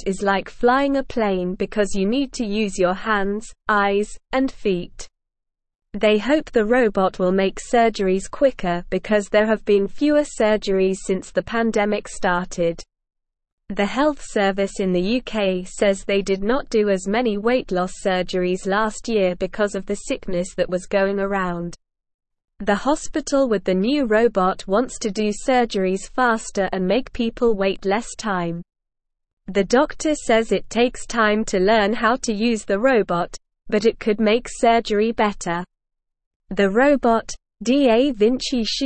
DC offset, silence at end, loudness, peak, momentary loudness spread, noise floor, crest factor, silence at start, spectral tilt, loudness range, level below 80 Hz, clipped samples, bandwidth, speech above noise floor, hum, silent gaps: 0.4%; 0 s; -20 LUFS; -4 dBFS; 7 LU; -81 dBFS; 16 dB; 0 s; -5 dB/octave; 4 LU; -42 dBFS; under 0.1%; 8.8 kHz; 61 dB; none; 13.52-13.58 s, 22.14-22.19 s, 29.33-29.37 s, 36.26-36.40 s